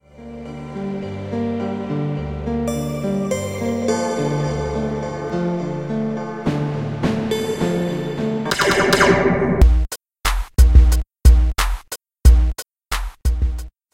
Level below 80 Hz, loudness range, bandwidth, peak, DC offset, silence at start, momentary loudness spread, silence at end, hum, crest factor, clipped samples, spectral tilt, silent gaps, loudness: -20 dBFS; 7 LU; 16 kHz; 0 dBFS; 0.2%; 0.2 s; 13 LU; 0.25 s; none; 18 dB; under 0.1%; -5.5 dB/octave; none; -20 LUFS